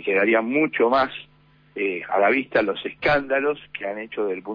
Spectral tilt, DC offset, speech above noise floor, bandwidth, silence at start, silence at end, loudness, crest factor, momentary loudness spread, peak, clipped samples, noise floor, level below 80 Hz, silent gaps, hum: -7.5 dB/octave; under 0.1%; 34 dB; 5.2 kHz; 0 s; 0 s; -22 LUFS; 14 dB; 11 LU; -8 dBFS; under 0.1%; -56 dBFS; -58 dBFS; none; none